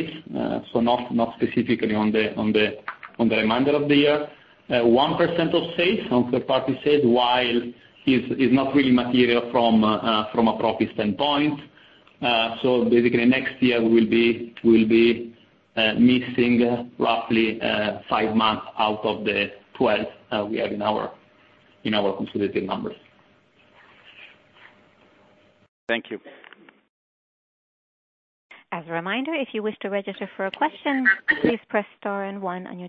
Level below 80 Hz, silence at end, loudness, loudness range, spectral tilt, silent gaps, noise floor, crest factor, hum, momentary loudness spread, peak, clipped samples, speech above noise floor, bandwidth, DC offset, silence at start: -58 dBFS; 0 s; -22 LUFS; 16 LU; -8 dB/octave; 25.68-25.87 s, 26.89-28.49 s; -58 dBFS; 18 dB; none; 11 LU; -4 dBFS; under 0.1%; 37 dB; 5.2 kHz; under 0.1%; 0 s